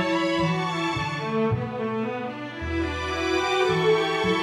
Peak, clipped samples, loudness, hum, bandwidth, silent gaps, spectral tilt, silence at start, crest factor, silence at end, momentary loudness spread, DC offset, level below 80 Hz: -10 dBFS; under 0.1%; -25 LUFS; none; 13 kHz; none; -5.5 dB/octave; 0 s; 14 dB; 0 s; 8 LU; under 0.1%; -44 dBFS